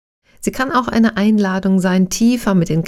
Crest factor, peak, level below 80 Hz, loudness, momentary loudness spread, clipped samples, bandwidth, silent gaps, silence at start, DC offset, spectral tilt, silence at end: 14 dB; -2 dBFS; -42 dBFS; -16 LUFS; 6 LU; under 0.1%; 14.5 kHz; none; 0.4 s; under 0.1%; -6 dB/octave; 0 s